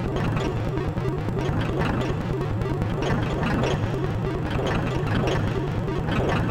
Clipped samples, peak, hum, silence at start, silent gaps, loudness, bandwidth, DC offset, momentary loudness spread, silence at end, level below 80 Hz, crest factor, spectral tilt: under 0.1%; -8 dBFS; none; 0 s; none; -25 LUFS; 15 kHz; under 0.1%; 3 LU; 0 s; -34 dBFS; 16 dB; -7 dB/octave